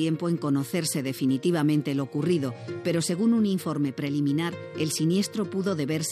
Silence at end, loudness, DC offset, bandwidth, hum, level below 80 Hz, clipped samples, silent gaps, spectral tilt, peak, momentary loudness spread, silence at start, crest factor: 0 s; -26 LUFS; under 0.1%; 15.5 kHz; none; -82 dBFS; under 0.1%; none; -5.5 dB/octave; -12 dBFS; 5 LU; 0 s; 12 dB